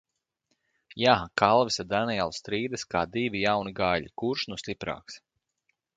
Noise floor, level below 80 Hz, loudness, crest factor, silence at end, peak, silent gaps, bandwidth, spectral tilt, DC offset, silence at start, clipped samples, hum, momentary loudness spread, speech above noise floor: -77 dBFS; -56 dBFS; -27 LUFS; 24 dB; 0.8 s; -4 dBFS; none; 9.4 kHz; -4.5 dB/octave; under 0.1%; 0.9 s; under 0.1%; none; 13 LU; 50 dB